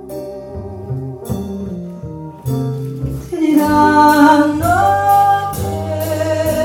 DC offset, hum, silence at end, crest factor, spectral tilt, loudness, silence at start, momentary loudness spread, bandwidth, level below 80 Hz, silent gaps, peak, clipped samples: under 0.1%; none; 0 s; 14 dB; -6 dB/octave; -14 LUFS; 0 s; 19 LU; 17.5 kHz; -40 dBFS; none; 0 dBFS; under 0.1%